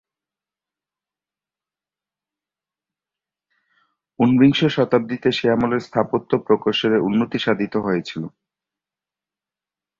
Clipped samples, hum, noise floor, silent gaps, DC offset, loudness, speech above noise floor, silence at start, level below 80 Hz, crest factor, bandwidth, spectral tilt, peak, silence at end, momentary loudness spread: under 0.1%; none; under -90 dBFS; none; under 0.1%; -19 LUFS; over 71 dB; 4.2 s; -58 dBFS; 20 dB; 7.4 kHz; -7 dB/octave; -2 dBFS; 1.7 s; 8 LU